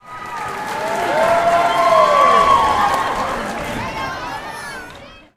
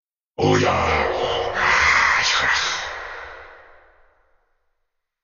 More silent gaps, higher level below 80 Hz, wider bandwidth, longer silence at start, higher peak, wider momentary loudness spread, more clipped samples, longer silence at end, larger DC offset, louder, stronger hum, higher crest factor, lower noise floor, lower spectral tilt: neither; about the same, -42 dBFS vs -42 dBFS; first, 16 kHz vs 7.4 kHz; second, 0.05 s vs 0.4 s; first, 0 dBFS vs -4 dBFS; about the same, 17 LU vs 18 LU; neither; second, 0.2 s vs 1.7 s; neither; about the same, -16 LUFS vs -18 LUFS; neither; about the same, 16 dB vs 18 dB; second, -39 dBFS vs -74 dBFS; about the same, -3.5 dB/octave vs -3 dB/octave